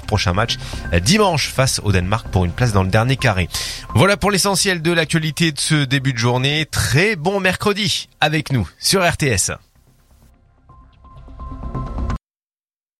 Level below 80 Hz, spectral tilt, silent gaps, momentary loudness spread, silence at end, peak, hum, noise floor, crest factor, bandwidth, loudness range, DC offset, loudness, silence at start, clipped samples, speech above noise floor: -34 dBFS; -4 dB/octave; none; 11 LU; 0.85 s; 0 dBFS; none; under -90 dBFS; 18 dB; 15.5 kHz; 6 LU; under 0.1%; -17 LUFS; 0 s; under 0.1%; over 73 dB